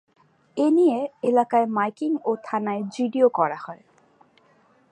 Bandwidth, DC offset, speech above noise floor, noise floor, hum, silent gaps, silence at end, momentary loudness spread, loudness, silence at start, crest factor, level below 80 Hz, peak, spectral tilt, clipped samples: 10 kHz; under 0.1%; 37 dB; -59 dBFS; none; none; 1.15 s; 8 LU; -23 LUFS; 0.55 s; 16 dB; -80 dBFS; -6 dBFS; -7 dB/octave; under 0.1%